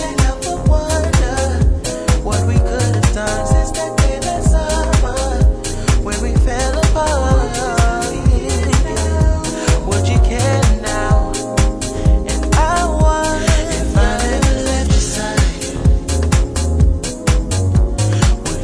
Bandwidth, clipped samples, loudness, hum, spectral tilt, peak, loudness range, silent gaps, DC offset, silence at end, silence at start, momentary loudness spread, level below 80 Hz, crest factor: 11 kHz; under 0.1%; -16 LUFS; none; -5 dB/octave; -2 dBFS; 1 LU; none; under 0.1%; 0 s; 0 s; 3 LU; -16 dBFS; 12 dB